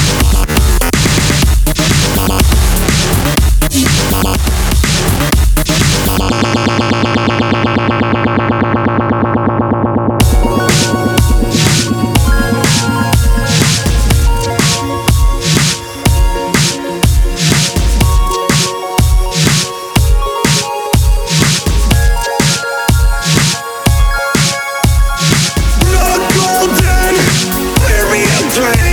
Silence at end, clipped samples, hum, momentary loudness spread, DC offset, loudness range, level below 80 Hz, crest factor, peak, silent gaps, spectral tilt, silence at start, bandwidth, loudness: 0 s; under 0.1%; none; 3 LU; under 0.1%; 1 LU; -14 dBFS; 10 dB; 0 dBFS; none; -4 dB/octave; 0 s; over 20 kHz; -11 LUFS